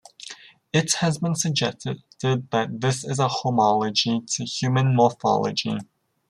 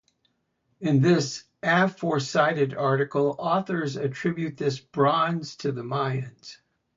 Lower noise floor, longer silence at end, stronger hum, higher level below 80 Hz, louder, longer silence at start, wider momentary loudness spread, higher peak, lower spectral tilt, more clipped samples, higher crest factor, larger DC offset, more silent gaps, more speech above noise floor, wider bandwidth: second, -43 dBFS vs -73 dBFS; about the same, 0.45 s vs 0.45 s; neither; about the same, -64 dBFS vs -66 dBFS; about the same, -23 LUFS vs -25 LUFS; second, 0.2 s vs 0.8 s; first, 13 LU vs 9 LU; about the same, -6 dBFS vs -8 dBFS; second, -4.5 dB/octave vs -6 dB/octave; neither; about the same, 18 dB vs 18 dB; neither; neither; second, 21 dB vs 48 dB; first, 13 kHz vs 7.8 kHz